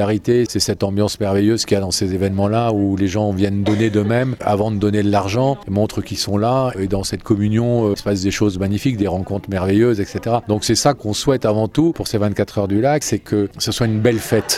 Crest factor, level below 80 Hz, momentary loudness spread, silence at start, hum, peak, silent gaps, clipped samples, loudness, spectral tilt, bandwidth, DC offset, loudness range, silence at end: 18 dB; -44 dBFS; 4 LU; 0 s; none; 0 dBFS; none; under 0.1%; -18 LUFS; -5.5 dB/octave; 16 kHz; under 0.1%; 1 LU; 0 s